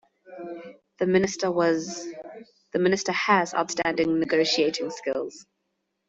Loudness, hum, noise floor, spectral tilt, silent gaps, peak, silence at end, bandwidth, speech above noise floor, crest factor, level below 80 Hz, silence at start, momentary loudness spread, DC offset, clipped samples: -24 LUFS; none; -78 dBFS; -4 dB/octave; none; -6 dBFS; 0.65 s; 8 kHz; 53 dB; 20 dB; -66 dBFS; 0.3 s; 17 LU; under 0.1%; under 0.1%